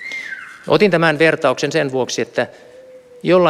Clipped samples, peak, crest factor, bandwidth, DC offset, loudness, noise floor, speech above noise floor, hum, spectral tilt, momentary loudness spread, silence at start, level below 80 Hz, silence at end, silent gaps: under 0.1%; -2 dBFS; 16 dB; 13.5 kHz; under 0.1%; -17 LUFS; -41 dBFS; 26 dB; none; -5 dB/octave; 13 LU; 0 s; -62 dBFS; 0 s; none